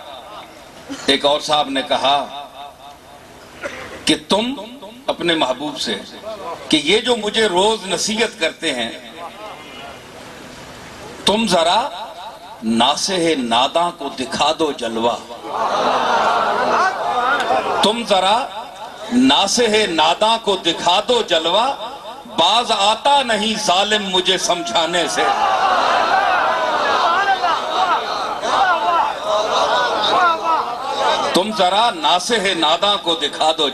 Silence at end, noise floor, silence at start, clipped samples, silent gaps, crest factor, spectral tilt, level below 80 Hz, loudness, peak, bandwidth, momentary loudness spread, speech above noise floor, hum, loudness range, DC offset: 0 s; -40 dBFS; 0 s; under 0.1%; none; 16 dB; -2.5 dB/octave; -52 dBFS; -16 LUFS; -2 dBFS; 13.5 kHz; 17 LU; 23 dB; none; 6 LU; under 0.1%